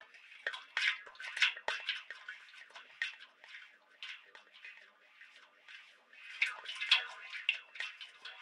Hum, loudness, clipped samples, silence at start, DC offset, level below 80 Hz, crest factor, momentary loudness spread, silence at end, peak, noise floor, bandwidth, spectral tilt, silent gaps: none; -36 LUFS; under 0.1%; 0 s; under 0.1%; under -90 dBFS; 28 dB; 23 LU; 0 s; -14 dBFS; -61 dBFS; 13.5 kHz; 3.5 dB/octave; none